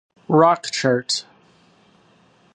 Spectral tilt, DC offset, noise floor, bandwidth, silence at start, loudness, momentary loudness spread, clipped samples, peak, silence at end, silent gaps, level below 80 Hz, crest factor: -4.5 dB/octave; under 0.1%; -56 dBFS; 11.5 kHz; 0.3 s; -19 LUFS; 9 LU; under 0.1%; -2 dBFS; 1.35 s; none; -72 dBFS; 20 dB